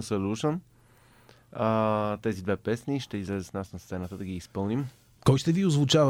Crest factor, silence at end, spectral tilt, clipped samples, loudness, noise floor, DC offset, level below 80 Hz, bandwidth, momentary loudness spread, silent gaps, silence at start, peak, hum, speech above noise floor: 22 dB; 0 s; -6 dB/octave; under 0.1%; -29 LUFS; -58 dBFS; under 0.1%; -56 dBFS; 15.5 kHz; 13 LU; none; 0 s; -6 dBFS; none; 31 dB